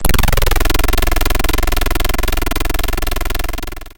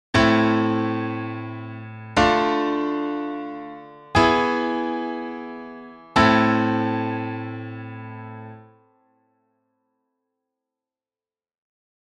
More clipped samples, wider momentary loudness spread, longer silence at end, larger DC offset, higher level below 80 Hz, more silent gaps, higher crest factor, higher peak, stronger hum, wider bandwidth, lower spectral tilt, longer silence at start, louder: neither; second, 6 LU vs 20 LU; second, 0.1 s vs 3.55 s; neither; first, -16 dBFS vs -46 dBFS; neither; second, 14 dB vs 20 dB; first, 0 dBFS vs -4 dBFS; neither; first, 17.5 kHz vs 10 kHz; second, -3.5 dB/octave vs -6 dB/octave; second, 0 s vs 0.15 s; first, -18 LUFS vs -22 LUFS